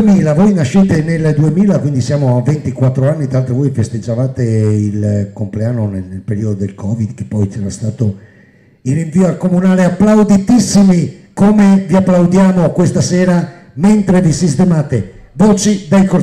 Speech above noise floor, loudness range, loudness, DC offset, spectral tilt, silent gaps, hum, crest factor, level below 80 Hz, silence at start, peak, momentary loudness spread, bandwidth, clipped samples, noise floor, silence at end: 34 dB; 8 LU; -12 LUFS; under 0.1%; -7 dB/octave; none; none; 8 dB; -40 dBFS; 0 s; -2 dBFS; 10 LU; 11 kHz; under 0.1%; -45 dBFS; 0 s